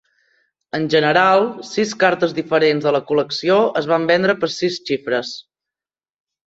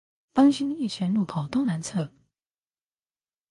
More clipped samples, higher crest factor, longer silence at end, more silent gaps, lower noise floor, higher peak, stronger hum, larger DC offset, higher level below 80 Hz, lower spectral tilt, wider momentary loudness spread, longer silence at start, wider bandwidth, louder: neither; about the same, 18 dB vs 18 dB; second, 1.05 s vs 1.45 s; neither; about the same, under -90 dBFS vs under -90 dBFS; first, -2 dBFS vs -8 dBFS; neither; neither; about the same, -64 dBFS vs -64 dBFS; about the same, -5 dB/octave vs -6 dB/octave; about the same, 9 LU vs 10 LU; first, 0.75 s vs 0.35 s; second, 8 kHz vs 11.5 kHz; first, -17 LUFS vs -25 LUFS